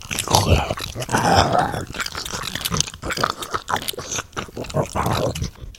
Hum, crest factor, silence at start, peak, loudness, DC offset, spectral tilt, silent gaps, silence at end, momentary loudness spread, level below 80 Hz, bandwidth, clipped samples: none; 22 dB; 0 s; 0 dBFS; -22 LUFS; under 0.1%; -3.5 dB/octave; none; 0 s; 10 LU; -36 dBFS; 17 kHz; under 0.1%